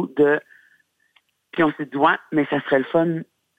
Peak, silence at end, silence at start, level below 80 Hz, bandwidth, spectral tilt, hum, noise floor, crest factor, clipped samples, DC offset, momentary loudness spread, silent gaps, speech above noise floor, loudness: -4 dBFS; 0.35 s; 0 s; -66 dBFS; 8 kHz; -8 dB/octave; none; -64 dBFS; 18 dB; under 0.1%; under 0.1%; 6 LU; none; 44 dB; -21 LUFS